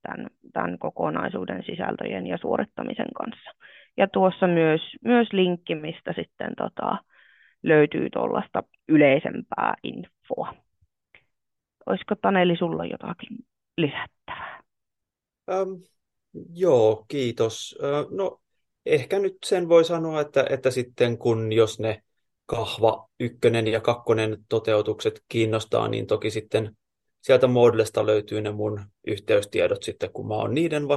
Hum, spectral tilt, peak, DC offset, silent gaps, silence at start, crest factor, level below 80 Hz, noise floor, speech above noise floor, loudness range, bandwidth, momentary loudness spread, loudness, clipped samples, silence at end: none; -6 dB/octave; -6 dBFS; under 0.1%; none; 0.1 s; 20 dB; -64 dBFS; -86 dBFS; 62 dB; 6 LU; 12.5 kHz; 15 LU; -24 LUFS; under 0.1%; 0 s